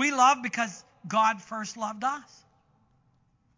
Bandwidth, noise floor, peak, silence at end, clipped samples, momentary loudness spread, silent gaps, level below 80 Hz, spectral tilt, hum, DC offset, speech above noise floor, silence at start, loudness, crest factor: 7.6 kHz; -67 dBFS; -8 dBFS; 1.35 s; under 0.1%; 14 LU; none; -76 dBFS; -2.5 dB/octave; none; under 0.1%; 40 dB; 0 s; -27 LUFS; 20 dB